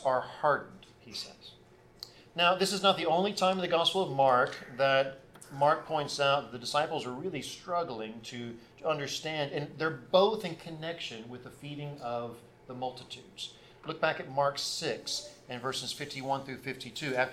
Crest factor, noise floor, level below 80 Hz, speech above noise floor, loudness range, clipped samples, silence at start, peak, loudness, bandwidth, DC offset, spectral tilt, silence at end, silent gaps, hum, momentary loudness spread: 22 dB; -52 dBFS; -68 dBFS; 20 dB; 8 LU; under 0.1%; 0 s; -10 dBFS; -31 LUFS; 15.5 kHz; under 0.1%; -3.5 dB/octave; 0 s; none; none; 18 LU